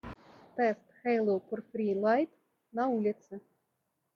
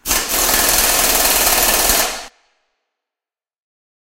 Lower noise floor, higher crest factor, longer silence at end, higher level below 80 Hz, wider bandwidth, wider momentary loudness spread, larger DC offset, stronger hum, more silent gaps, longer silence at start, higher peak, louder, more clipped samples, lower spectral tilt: second, -81 dBFS vs under -90 dBFS; about the same, 18 dB vs 18 dB; second, 0.75 s vs 1.75 s; second, -68 dBFS vs -34 dBFS; second, 6.8 kHz vs 16.5 kHz; first, 19 LU vs 4 LU; neither; neither; neither; about the same, 0.05 s vs 0.05 s; second, -14 dBFS vs 0 dBFS; second, -32 LUFS vs -12 LUFS; neither; first, -8 dB/octave vs 0 dB/octave